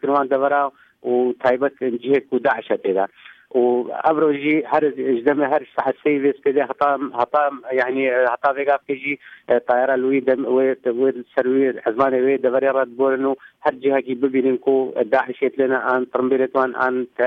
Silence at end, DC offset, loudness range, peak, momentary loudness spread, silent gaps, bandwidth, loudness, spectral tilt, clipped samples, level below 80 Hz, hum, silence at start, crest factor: 0 s; under 0.1%; 1 LU; -4 dBFS; 4 LU; none; 4.8 kHz; -20 LUFS; -8 dB/octave; under 0.1%; -66 dBFS; none; 0.05 s; 14 dB